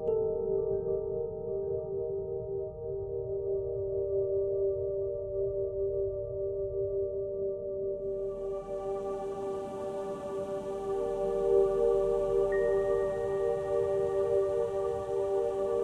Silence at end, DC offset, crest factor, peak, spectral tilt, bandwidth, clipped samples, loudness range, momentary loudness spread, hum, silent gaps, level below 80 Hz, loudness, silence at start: 0 s; under 0.1%; 16 dB; -16 dBFS; -8 dB/octave; 9.6 kHz; under 0.1%; 6 LU; 8 LU; none; none; -52 dBFS; -32 LUFS; 0 s